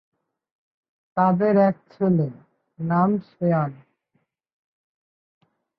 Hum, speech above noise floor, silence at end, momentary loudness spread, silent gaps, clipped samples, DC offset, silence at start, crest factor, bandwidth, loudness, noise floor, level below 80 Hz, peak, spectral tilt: none; 51 dB; 2.05 s; 12 LU; none; under 0.1%; under 0.1%; 1.15 s; 18 dB; 5 kHz; -22 LUFS; -72 dBFS; -68 dBFS; -6 dBFS; -12.5 dB/octave